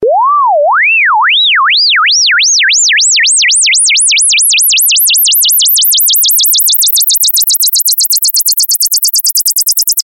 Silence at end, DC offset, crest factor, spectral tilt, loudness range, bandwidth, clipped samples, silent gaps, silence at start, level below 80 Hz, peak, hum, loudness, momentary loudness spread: 0.05 s; under 0.1%; 8 dB; 4.5 dB/octave; 1 LU; 17 kHz; under 0.1%; none; 0 s; -64 dBFS; 0 dBFS; none; -5 LUFS; 3 LU